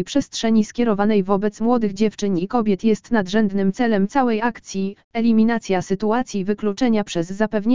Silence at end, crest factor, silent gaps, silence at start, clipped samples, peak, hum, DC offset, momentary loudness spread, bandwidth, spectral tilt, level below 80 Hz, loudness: 0 s; 16 dB; 5.04-5.11 s; 0 s; under 0.1%; -4 dBFS; none; 2%; 5 LU; 7.6 kHz; -6 dB/octave; -50 dBFS; -20 LUFS